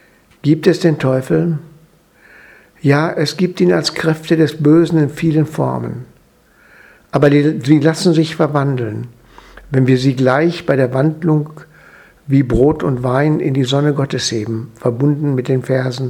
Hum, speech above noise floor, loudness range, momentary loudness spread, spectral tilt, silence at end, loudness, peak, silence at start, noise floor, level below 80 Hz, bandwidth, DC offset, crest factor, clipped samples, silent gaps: none; 37 dB; 2 LU; 9 LU; -6.5 dB/octave; 0 s; -15 LUFS; 0 dBFS; 0.45 s; -51 dBFS; -42 dBFS; 13.5 kHz; under 0.1%; 16 dB; under 0.1%; none